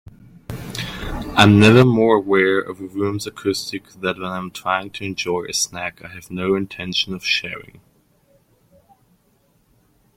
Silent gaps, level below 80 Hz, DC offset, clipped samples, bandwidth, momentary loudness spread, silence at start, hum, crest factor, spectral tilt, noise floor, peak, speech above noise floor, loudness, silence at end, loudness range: none; -44 dBFS; under 0.1%; under 0.1%; 16.5 kHz; 17 LU; 0.5 s; none; 20 dB; -5 dB/octave; -61 dBFS; 0 dBFS; 42 dB; -19 LUFS; 2.55 s; 9 LU